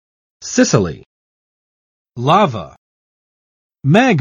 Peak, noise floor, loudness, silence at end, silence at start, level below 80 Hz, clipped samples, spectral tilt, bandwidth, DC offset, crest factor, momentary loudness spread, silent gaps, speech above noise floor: 0 dBFS; under -90 dBFS; -15 LUFS; 0 s; 0.4 s; -50 dBFS; under 0.1%; -5.5 dB/octave; 8.4 kHz; under 0.1%; 18 dB; 23 LU; 1.06-2.05 s, 2.78-3.70 s; over 77 dB